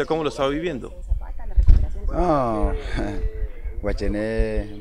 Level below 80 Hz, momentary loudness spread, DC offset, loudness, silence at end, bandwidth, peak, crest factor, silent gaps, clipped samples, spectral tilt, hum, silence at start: -22 dBFS; 10 LU; under 0.1%; -25 LUFS; 0 s; 9.8 kHz; 0 dBFS; 20 dB; none; under 0.1%; -7.5 dB/octave; none; 0 s